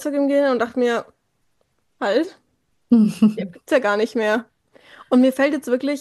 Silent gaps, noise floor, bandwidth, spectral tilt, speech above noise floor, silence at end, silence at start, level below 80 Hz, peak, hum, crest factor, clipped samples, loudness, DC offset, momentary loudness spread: none; -69 dBFS; 12.5 kHz; -6 dB/octave; 50 dB; 0 s; 0 s; -68 dBFS; -4 dBFS; none; 16 dB; under 0.1%; -19 LUFS; under 0.1%; 7 LU